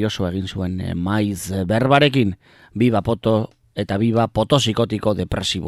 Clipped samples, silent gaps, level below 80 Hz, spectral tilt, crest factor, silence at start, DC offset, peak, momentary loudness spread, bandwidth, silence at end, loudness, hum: under 0.1%; none; -40 dBFS; -6 dB/octave; 16 dB; 0 s; under 0.1%; -2 dBFS; 10 LU; 14.5 kHz; 0 s; -20 LUFS; none